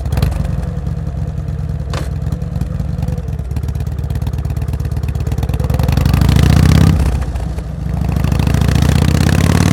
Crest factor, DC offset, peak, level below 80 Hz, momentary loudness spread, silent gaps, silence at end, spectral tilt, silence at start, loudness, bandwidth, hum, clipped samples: 14 dB; under 0.1%; 0 dBFS; -20 dBFS; 11 LU; none; 0 s; -6.5 dB/octave; 0 s; -16 LUFS; 17 kHz; none; under 0.1%